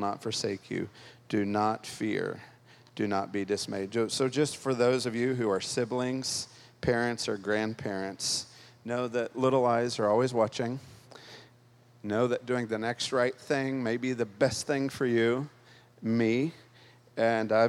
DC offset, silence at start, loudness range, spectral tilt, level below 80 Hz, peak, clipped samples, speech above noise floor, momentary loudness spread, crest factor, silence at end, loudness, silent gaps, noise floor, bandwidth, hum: under 0.1%; 0 s; 3 LU; -4.5 dB/octave; -66 dBFS; -12 dBFS; under 0.1%; 30 dB; 10 LU; 18 dB; 0 s; -30 LUFS; none; -59 dBFS; 14.5 kHz; none